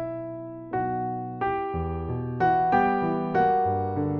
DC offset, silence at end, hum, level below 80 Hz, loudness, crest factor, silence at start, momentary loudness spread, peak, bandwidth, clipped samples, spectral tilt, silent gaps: under 0.1%; 0 s; none; -46 dBFS; -26 LUFS; 16 dB; 0 s; 11 LU; -10 dBFS; 5.8 kHz; under 0.1%; -6.5 dB/octave; none